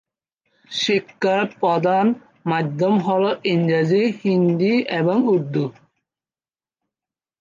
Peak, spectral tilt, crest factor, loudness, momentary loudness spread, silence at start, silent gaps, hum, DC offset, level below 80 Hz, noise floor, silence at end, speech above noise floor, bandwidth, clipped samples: -6 dBFS; -6.5 dB/octave; 14 dB; -20 LUFS; 6 LU; 0.7 s; none; none; under 0.1%; -70 dBFS; under -90 dBFS; 1.7 s; over 71 dB; 7.4 kHz; under 0.1%